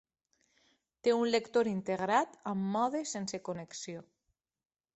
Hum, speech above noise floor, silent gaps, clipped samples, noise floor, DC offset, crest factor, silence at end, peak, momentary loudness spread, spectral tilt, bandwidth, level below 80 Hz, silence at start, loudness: none; 50 dB; none; under 0.1%; -83 dBFS; under 0.1%; 20 dB; 0.95 s; -14 dBFS; 12 LU; -4.5 dB/octave; 8.4 kHz; -76 dBFS; 1.05 s; -33 LUFS